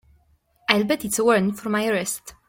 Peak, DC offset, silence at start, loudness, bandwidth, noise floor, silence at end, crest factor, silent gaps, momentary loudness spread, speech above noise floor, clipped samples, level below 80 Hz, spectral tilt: -2 dBFS; under 0.1%; 0.7 s; -22 LUFS; 16.5 kHz; -62 dBFS; 0.15 s; 22 dB; none; 7 LU; 39 dB; under 0.1%; -60 dBFS; -3.5 dB/octave